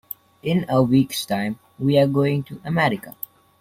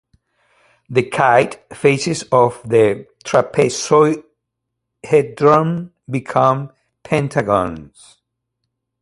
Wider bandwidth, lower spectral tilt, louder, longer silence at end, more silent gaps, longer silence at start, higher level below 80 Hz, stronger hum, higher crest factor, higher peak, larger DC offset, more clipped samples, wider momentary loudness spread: first, 16.5 kHz vs 11.5 kHz; about the same, -6.5 dB/octave vs -5.5 dB/octave; second, -21 LUFS vs -16 LUFS; second, 0.5 s vs 1.15 s; neither; second, 0.45 s vs 0.9 s; about the same, -56 dBFS vs -52 dBFS; neither; about the same, 16 dB vs 18 dB; second, -6 dBFS vs 0 dBFS; neither; neither; first, 16 LU vs 12 LU